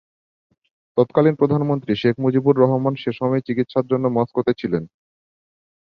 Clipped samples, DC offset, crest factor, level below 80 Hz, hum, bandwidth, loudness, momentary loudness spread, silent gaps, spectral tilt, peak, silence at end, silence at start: under 0.1%; under 0.1%; 18 dB; -58 dBFS; none; 6 kHz; -20 LUFS; 7 LU; none; -10 dB/octave; -2 dBFS; 1.05 s; 0.95 s